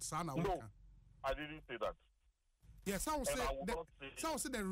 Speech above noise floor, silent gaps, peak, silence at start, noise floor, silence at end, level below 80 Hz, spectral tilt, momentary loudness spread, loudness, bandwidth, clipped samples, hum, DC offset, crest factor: 36 dB; none; -28 dBFS; 0 s; -77 dBFS; 0 s; -54 dBFS; -4 dB/octave; 9 LU; -42 LUFS; 16 kHz; under 0.1%; none; under 0.1%; 14 dB